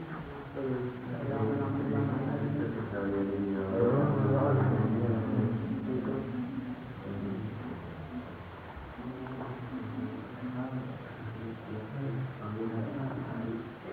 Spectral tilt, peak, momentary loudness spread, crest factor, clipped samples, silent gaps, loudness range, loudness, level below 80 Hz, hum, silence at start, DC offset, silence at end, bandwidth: -10.5 dB/octave; -14 dBFS; 14 LU; 18 dB; under 0.1%; none; 11 LU; -34 LUFS; -58 dBFS; none; 0 s; under 0.1%; 0 s; 4.6 kHz